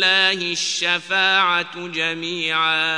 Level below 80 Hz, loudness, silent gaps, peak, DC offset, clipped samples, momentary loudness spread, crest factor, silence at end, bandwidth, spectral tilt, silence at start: -76 dBFS; -18 LUFS; none; -4 dBFS; 0.1%; under 0.1%; 7 LU; 16 dB; 0 s; 10 kHz; -1 dB/octave; 0 s